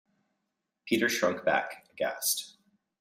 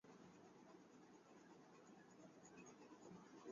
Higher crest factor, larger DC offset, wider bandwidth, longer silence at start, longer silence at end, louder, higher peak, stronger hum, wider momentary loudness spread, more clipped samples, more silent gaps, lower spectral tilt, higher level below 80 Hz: about the same, 20 dB vs 18 dB; neither; first, 16 kHz vs 7.2 kHz; first, 0.85 s vs 0.05 s; first, 0.5 s vs 0 s; first, -29 LUFS vs -65 LUFS; first, -12 dBFS vs -46 dBFS; neither; first, 15 LU vs 4 LU; neither; neither; second, -2.5 dB/octave vs -5 dB/octave; first, -74 dBFS vs under -90 dBFS